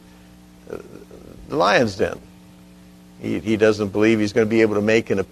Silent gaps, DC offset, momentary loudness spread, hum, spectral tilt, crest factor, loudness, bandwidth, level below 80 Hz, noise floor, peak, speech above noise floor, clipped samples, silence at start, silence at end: none; under 0.1%; 19 LU; 60 Hz at -50 dBFS; -5.5 dB/octave; 18 dB; -19 LUFS; 13.5 kHz; -52 dBFS; -46 dBFS; -2 dBFS; 28 dB; under 0.1%; 0.7 s; 0.05 s